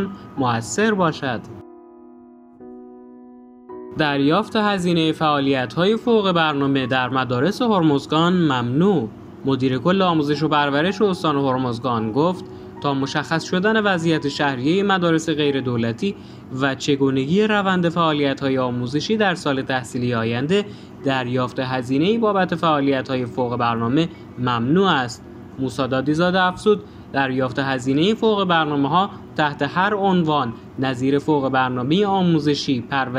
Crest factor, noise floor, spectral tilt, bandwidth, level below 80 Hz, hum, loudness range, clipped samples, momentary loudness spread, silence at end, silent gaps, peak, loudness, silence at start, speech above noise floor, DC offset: 18 dB; -45 dBFS; -6 dB/octave; 11.5 kHz; -56 dBFS; none; 3 LU; under 0.1%; 8 LU; 0 s; none; -2 dBFS; -20 LUFS; 0 s; 26 dB; under 0.1%